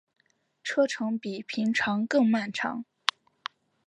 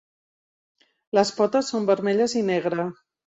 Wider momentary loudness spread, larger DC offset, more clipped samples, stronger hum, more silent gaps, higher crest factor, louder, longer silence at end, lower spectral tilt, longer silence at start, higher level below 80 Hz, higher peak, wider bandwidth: first, 17 LU vs 6 LU; neither; neither; neither; neither; first, 28 dB vs 18 dB; second, -28 LUFS vs -23 LUFS; first, 1.05 s vs 0.4 s; about the same, -4.5 dB/octave vs -5 dB/octave; second, 0.65 s vs 1.15 s; about the same, -74 dBFS vs -70 dBFS; first, 0 dBFS vs -6 dBFS; first, 11 kHz vs 8.2 kHz